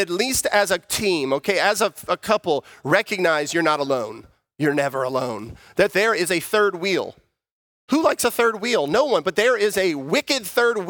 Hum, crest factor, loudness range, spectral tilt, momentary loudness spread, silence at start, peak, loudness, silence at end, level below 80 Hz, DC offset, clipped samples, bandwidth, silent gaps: none; 20 dB; 2 LU; -3 dB/octave; 6 LU; 0 s; -2 dBFS; -21 LUFS; 0 s; -56 dBFS; under 0.1%; under 0.1%; over 20 kHz; 7.51-7.88 s